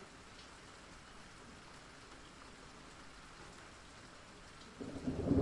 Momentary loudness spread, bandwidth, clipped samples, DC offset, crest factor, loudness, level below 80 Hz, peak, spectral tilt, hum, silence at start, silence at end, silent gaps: 12 LU; 11.5 kHz; under 0.1%; under 0.1%; 26 dB; -49 LUFS; -62 dBFS; -20 dBFS; -6 dB/octave; none; 0 s; 0 s; none